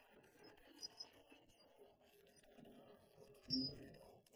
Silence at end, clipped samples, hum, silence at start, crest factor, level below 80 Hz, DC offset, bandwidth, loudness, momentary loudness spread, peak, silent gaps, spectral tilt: 0 s; under 0.1%; none; 0 s; 24 dB; -78 dBFS; under 0.1%; over 20 kHz; -48 LUFS; 25 LU; -30 dBFS; none; -4 dB/octave